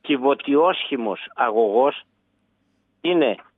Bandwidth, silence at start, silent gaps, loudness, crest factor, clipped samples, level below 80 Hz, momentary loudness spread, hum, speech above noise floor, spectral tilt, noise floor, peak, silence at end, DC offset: 4 kHz; 0.05 s; none; -21 LUFS; 16 dB; under 0.1%; -80 dBFS; 9 LU; none; 48 dB; -7.5 dB/octave; -68 dBFS; -6 dBFS; 0.15 s; under 0.1%